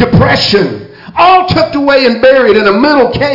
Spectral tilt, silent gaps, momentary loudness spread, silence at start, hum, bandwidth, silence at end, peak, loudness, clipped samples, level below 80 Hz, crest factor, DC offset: -6.5 dB/octave; none; 6 LU; 0 s; none; 5.8 kHz; 0 s; 0 dBFS; -7 LUFS; under 0.1%; -34 dBFS; 8 dB; under 0.1%